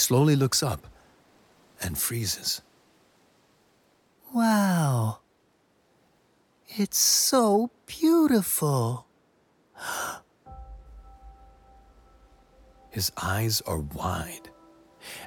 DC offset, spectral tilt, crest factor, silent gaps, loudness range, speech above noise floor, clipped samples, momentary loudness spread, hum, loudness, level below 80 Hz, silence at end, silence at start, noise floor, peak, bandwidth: under 0.1%; -4 dB/octave; 20 dB; none; 14 LU; 42 dB; under 0.1%; 19 LU; none; -25 LUFS; -52 dBFS; 0 s; 0 s; -66 dBFS; -8 dBFS; 19 kHz